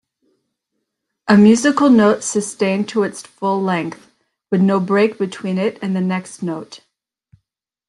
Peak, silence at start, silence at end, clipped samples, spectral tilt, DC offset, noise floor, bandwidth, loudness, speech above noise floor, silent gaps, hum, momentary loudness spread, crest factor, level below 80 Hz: -2 dBFS; 1.25 s; 1.1 s; under 0.1%; -5.5 dB/octave; under 0.1%; -76 dBFS; 11.5 kHz; -16 LUFS; 60 dB; none; none; 14 LU; 16 dB; -62 dBFS